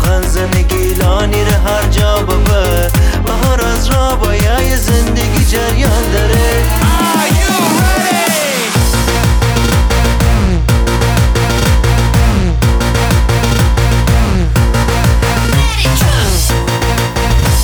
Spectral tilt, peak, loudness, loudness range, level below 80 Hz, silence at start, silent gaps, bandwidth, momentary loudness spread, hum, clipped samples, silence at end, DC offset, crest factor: -5 dB/octave; 0 dBFS; -12 LUFS; 1 LU; -14 dBFS; 0 s; none; over 20 kHz; 2 LU; none; under 0.1%; 0 s; under 0.1%; 10 dB